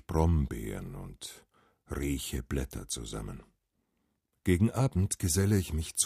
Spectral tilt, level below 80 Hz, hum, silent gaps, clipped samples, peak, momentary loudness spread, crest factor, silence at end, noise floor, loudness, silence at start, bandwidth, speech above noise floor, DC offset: -5 dB/octave; -42 dBFS; none; none; under 0.1%; -12 dBFS; 16 LU; 20 dB; 0 s; -79 dBFS; -31 LUFS; 0.1 s; 15.5 kHz; 48 dB; under 0.1%